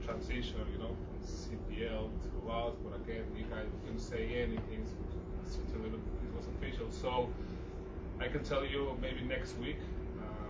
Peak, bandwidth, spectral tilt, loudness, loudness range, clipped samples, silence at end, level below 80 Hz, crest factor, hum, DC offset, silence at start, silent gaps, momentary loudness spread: -22 dBFS; 8 kHz; -6.5 dB/octave; -41 LUFS; 2 LU; under 0.1%; 0 s; -44 dBFS; 18 dB; none; under 0.1%; 0 s; none; 7 LU